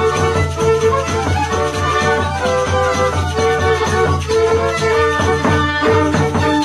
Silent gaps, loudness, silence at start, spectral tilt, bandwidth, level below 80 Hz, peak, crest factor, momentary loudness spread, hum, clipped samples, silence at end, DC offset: none; -15 LUFS; 0 s; -5 dB/octave; 13 kHz; -32 dBFS; -2 dBFS; 14 dB; 3 LU; none; under 0.1%; 0 s; under 0.1%